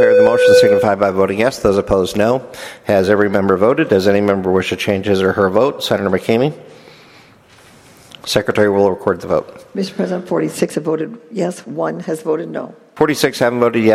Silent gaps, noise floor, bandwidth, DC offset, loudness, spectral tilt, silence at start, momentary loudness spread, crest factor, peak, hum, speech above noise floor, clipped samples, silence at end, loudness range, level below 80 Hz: none; -45 dBFS; 15 kHz; under 0.1%; -15 LUFS; -5.5 dB/octave; 0 s; 10 LU; 16 dB; 0 dBFS; none; 30 dB; under 0.1%; 0 s; 6 LU; -46 dBFS